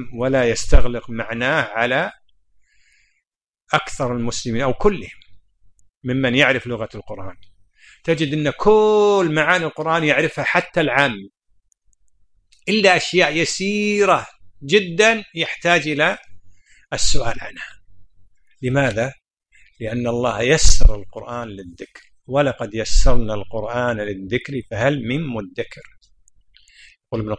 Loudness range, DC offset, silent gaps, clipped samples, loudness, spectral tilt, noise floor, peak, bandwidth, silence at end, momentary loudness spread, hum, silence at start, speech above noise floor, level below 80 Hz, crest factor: 7 LU; under 0.1%; 5.97-6.01 s; under 0.1%; -19 LUFS; -4 dB/octave; -77 dBFS; 0 dBFS; 10 kHz; 0 s; 16 LU; none; 0 s; 61 dB; -26 dBFS; 18 dB